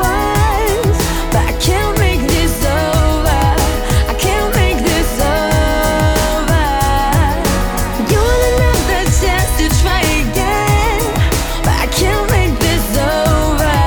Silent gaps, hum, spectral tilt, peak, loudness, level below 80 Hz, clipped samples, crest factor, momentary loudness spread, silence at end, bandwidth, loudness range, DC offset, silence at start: none; none; -4.5 dB/octave; -2 dBFS; -14 LUFS; -18 dBFS; under 0.1%; 10 dB; 2 LU; 0 s; over 20 kHz; 1 LU; under 0.1%; 0 s